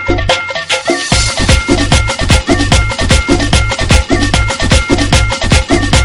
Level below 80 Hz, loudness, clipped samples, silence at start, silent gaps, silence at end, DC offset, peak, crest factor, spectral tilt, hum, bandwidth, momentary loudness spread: -16 dBFS; -11 LUFS; 0.4%; 0 s; none; 0 s; under 0.1%; 0 dBFS; 10 dB; -4 dB/octave; none; 12 kHz; 2 LU